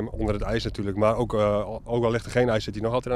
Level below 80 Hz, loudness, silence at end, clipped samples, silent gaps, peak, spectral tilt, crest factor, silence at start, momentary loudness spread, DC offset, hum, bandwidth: -38 dBFS; -25 LUFS; 0 s; under 0.1%; none; -8 dBFS; -6.5 dB/octave; 16 dB; 0 s; 5 LU; under 0.1%; none; 13 kHz